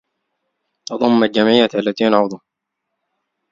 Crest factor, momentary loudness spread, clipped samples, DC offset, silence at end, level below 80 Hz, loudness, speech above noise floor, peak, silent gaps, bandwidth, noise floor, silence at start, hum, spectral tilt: 18 dB; 17 LU; under 0.1%; under 0.1%; 1.15 s; -62 dBFS; -15 LUFS; 63 dB; 0 dBFS; none; 7.4 kHz; -78 dBFS; 0.9 s; none; -5.5 dB/octave